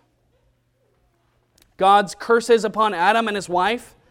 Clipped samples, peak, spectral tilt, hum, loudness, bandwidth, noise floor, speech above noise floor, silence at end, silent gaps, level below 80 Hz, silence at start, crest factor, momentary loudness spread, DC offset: under 0.1%; -4 dBFS; -4 dB/octave; none; -19 LUFS; 15.5 kHz; -65 dBFS; 46 dB; 0.25 s; none; -60 dBFS; 1.8 s; 18 dB; 6 LU; under 0.1%